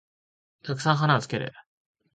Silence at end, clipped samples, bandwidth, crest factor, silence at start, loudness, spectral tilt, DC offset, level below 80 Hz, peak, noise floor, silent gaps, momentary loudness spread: 0.55 s; under 0.1%; 9.2 kHz; 22 dB; 0.65 s; -25 LUFS; -5.5 dB/octave; under 0.1%; -66 dBFS; -8 dBFS; under -90 dBFS; none; 15 LU